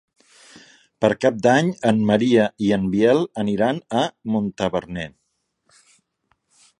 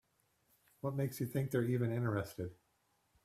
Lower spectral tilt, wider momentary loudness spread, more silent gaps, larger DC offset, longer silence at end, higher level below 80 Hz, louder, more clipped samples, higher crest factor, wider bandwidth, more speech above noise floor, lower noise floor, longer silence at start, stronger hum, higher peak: about the same, -6.5 dB/octave vs -7.5 dB/octave; about the same, 8 LU vs 9 LU; neither; neither; first, 1.7 s vs 0.7 s; first, -54 dBFS vs -70 dBFS; first, -20 LUFS vs -38 LUFS; neither; about the same, 20 dB vs 16 dB; second, 10.5 kHz vs 15.5 kHz; first, 53 dB vs 41 dB; second, -72 dBFS vs -78 dBFS; first, 1 s vs 0.85 s; neither; first, -2 dBFS vs -22 dBFS